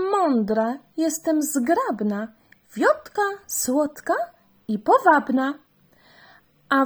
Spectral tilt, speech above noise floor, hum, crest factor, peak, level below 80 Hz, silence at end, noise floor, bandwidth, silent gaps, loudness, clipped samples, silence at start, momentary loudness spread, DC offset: -4 dB/octave; 34 dB; none; 20 dB; -2 dBFS; -66 dBFS; 0 s; -56 dBFS; over 20 kHz; none; -22 LUFS; under 0.1%; 0 s; 13 LU; under 0.1%